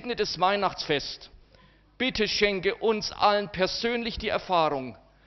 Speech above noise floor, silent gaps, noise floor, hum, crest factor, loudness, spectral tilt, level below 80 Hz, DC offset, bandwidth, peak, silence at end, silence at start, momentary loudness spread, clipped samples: 31 dB; none; -58 dBFS; none; 18 dB; -26 LUFS; -1.5 dB/octave; -50 dBFS; under 0.1%; 6.4 kHz; -10 dBFS; 0.3 s; 0 s; 6 LU; under 0.1%